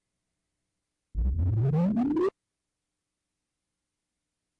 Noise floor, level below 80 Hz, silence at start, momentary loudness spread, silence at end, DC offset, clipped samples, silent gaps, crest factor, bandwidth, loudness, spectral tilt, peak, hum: -86 dBFS; -40 dBFS; 1.15 s; 7 LU; 2.3 s; under 0.1%; under 0.1%; none; 10 dB; 6 kHz; -28 LUFS; -11 dB/octave; -20 dBFS; none